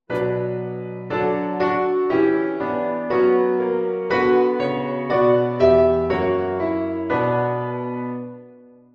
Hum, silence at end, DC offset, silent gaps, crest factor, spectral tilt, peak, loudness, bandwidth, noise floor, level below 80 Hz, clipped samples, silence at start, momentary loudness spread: none; 0.4 s; under 0.1%; none; 16 dB; -8.5 dB/octave; -4 dBFS; -20 LUFS; 5.8 kHz; -47 dBFS; -50 dBFS; under 0.1%; 0.1 s; 10 LU